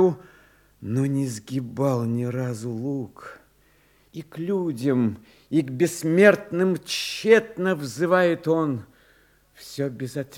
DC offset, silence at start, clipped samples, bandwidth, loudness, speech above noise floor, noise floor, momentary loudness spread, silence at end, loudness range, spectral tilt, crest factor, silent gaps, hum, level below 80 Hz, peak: under 0.1%; 0 s; under 0.1%; 17.5 kHz; -24 LUFS; 36 dB; -60 dBFS; 19 LU; 0 s; 8 LU; -6 dB/octave; 22 dB; none; 50 Hz at -60 dBFS; -66 dBFS; -2 dBFS